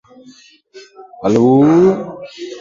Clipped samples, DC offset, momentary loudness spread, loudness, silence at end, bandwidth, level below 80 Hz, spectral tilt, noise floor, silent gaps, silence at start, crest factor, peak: under 0.1%; under 0.1%; 20 LU; -12 LUFS; 0 s; 7.6 kHz; -54 dBFS; -8 dB/octave; -44 dBFS; none; 0.75 s; 14 dB; 0 dBFS